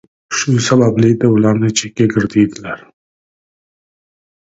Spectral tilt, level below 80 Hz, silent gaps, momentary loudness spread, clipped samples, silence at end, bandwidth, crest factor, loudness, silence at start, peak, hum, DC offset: -5.5 dB/octave; -50 dBFS; none; 12 LU; under 0.1%; 1.65 s; 8 kHz; 16 dB; -13 LUFS; 0.3 s; 0 dBFS; none; under 0.1%